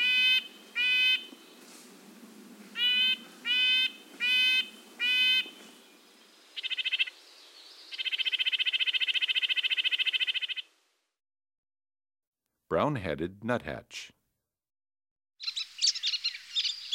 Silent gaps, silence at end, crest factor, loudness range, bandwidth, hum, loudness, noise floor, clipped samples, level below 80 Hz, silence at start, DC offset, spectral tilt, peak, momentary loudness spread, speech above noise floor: 11.58-11.63 s, 12.27-12.32 s, 15.11-15.16 s; 0 s; 18 dB; 10 LU; 16 kHz; none; -27 LUFS; -83 dBFS; under 0.1%; -68 dBFS; 0 s; under 0.1%; -1.5 dB/octave; -12 dBFS; 15 LU; 50 dB